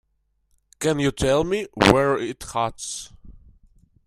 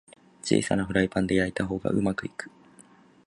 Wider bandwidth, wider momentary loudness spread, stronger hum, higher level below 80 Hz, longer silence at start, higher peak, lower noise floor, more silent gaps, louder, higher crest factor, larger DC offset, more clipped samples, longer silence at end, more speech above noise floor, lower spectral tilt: first, 15.5 kHz vs 11.5 kHz; about the same, 14 LU vs 13 LU; neither; first, -44 dBFS vs -50 dBFS; first, 0.8 s vs 0.45 s; first, 0 dBFS vs -8 dBFS; first, -69 dBFS vs -55 dBFS; neither; first, -22 LUFS vs -27 LUFS; about the same, 24 dB vs 20 dB; neither; neither; about the same, 0.75 s vs 0.8 s; first, 48 dB vs 29 dB; about the same, -4.5 dB/octave vs -5.5 dB/octave